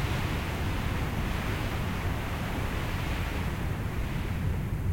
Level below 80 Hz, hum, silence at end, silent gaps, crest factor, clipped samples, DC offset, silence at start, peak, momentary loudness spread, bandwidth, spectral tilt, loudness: -36 dBFS; none; 0 s; none; 14 dB; under 0.1%; under 0.1%; 0 s; -18 dBFS; 2 LU; 17 kHz; -6 dB/octave; -32 LUFS